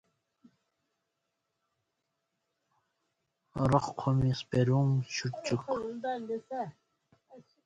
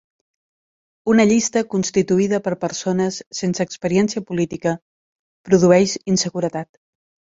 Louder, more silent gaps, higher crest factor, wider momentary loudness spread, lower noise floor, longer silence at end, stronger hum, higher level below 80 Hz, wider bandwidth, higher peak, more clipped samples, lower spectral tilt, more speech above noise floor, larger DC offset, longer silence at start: second, -31 LUFS vs -19 LUFS; second, none vs 3.27-3.31 s, 4.82-5.44 s; about the same, 22 dB vs 18 dB; about the same, 11 LU vs 10 LU; second, -84 dBFS vs under -90 dBFS; second, 0.25 s vs 0.7 s; neither; about the same, -58 dBFS vs -58 dBFS; first, 9 kHz vs 7.8 kHz; second, -12 dBFS vs -2 dBFS; neither; first, -6.5 dB/octave vs -5 dB/octave; second, 54 dB vs over 72 dB; neither; first, 3.55 s vs 1.05 s